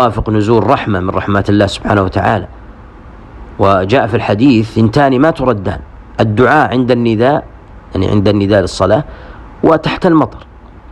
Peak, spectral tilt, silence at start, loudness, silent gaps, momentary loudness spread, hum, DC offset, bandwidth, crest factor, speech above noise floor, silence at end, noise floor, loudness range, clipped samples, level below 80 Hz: 0 dBFS; -7.5 dB/octave; 0 s; -12 LUFS; none; 8 LU; none; under 0.1%; 11 kHz; 12 dB; 23 dB; 0 s; -34 dBFS; 3 LU; 0.3%; -34 dBFS